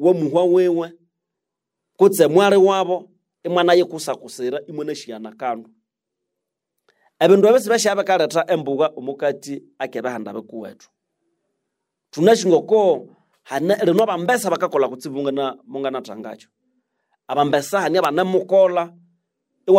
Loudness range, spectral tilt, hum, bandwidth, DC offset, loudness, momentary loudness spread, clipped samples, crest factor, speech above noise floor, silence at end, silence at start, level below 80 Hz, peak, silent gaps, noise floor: 7 LU; -5 dB/octave; none; 16 kHz; under 0.1%; -18 LUFS; 17 LU; under 0.1%; 18 dB; 64 dB; 0 s; 0 s; -74 dBFS; -2 dBFS; none; -82 dBFS